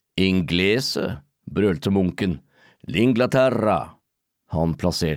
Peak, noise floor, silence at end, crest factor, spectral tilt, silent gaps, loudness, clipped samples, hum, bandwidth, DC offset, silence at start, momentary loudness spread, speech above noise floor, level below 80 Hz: -8 dBFS; -76 dBFS; 0 s; 14 dB; -6 dB/octave; none; -22 LUFS; under 0.1%; none; 16 kHz; under 0.1%; 0.15 s; 12 LU; 55 dB; -46 dBFS